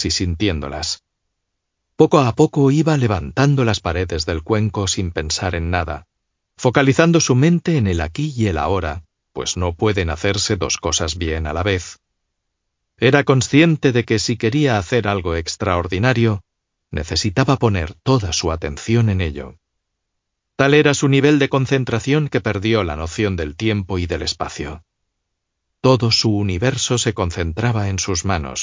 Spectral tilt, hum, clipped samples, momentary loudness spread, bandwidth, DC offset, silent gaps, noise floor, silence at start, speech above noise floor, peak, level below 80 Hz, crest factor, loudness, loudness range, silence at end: -5 dB/octave; none; under 0.1%; 10 LU; 7.6 kHz; under 0.1%; none; -76 dBFS; 0 s; 59 dB; 0 dBFS; -34 dBFS; 18 dB; -18 LUFS; 4 LU; 0 s